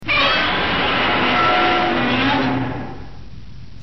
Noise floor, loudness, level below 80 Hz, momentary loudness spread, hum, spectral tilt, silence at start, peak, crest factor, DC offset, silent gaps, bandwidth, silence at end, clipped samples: -38 dBFS; -16 LUFS; -40 dBFS; 12 LU; none; -5.5 dB/octave; 0 s; -6 dBFS; 12 dB; 2%; none; 6.2 kHz; 0 s; under 0.1%